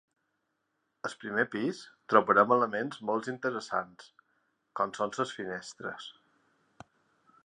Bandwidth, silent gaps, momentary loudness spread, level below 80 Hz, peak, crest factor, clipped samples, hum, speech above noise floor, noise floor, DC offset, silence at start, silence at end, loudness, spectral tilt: 10.5 kHz; none; 18 LU; -78 dBFS; -8 dBFS; 26 dB; under 0.1%; none; 49 dB; -80 dBFS; under 0.1%; 1.05 s; 1.35 s; -30 LUFS; -5 dB/octave